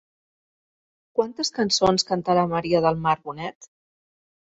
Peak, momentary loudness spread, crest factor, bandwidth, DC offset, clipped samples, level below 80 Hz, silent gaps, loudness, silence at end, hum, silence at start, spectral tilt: -6 dBFS; 11 LU; 20 dB; 8 kHz; under 0.1%; under 0.1%; -56 dBFS; 3.55-3.61 s; -22 LUFS; 0.85 s; none; 1.15 s; -4.5 dB/octave